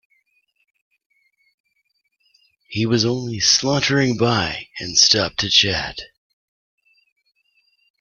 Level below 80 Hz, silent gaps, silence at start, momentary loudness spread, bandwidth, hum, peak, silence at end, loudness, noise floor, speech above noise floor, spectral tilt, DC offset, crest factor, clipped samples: -52 dBFS; none; 2.7 s; 13 LU; 11 kHz; none; 0 dBFS; 1.95 s; -17 LUFS; -70 dBFS; 51 dB; -3 dB/octave; under 0.1%; 22 dB; under 0.1%